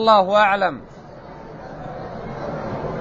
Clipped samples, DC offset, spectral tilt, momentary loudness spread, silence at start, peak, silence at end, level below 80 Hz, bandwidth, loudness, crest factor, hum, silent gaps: under 0.1%; under 0.1%; -6 dB/octave; 24 LU; 0 s; -2 dBFS; 0 s; -46 dBFS; 8 kHz; -19 LUFS; 20 dB; none; none